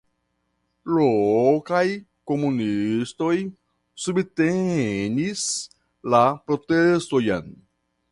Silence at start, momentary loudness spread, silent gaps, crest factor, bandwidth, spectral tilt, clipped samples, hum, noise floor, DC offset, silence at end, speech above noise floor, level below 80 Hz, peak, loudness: 0.85 s; 10 LU; none; 18 dB; 11.5 kHz; -5.5 dB/octave; under 0.1%; none; -73 dBFS; under 0.1%; 0.6 s; 51 dB; -58 dBFS; -4 dBFS; -22 LUFS